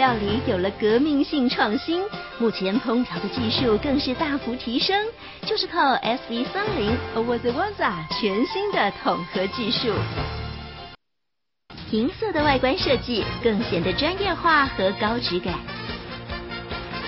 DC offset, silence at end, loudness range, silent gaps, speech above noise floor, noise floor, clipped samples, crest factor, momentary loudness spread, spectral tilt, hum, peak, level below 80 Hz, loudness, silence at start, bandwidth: under 0.1%; 0 s; 4 LU; none; 61 dB; -84 dBFS; under 0.1%; 18 dB; 11 LU; -3 dB/octave; none; -6 dBFS; -44 dBFS; -23 LUFS; 0 s; 5.8 kHz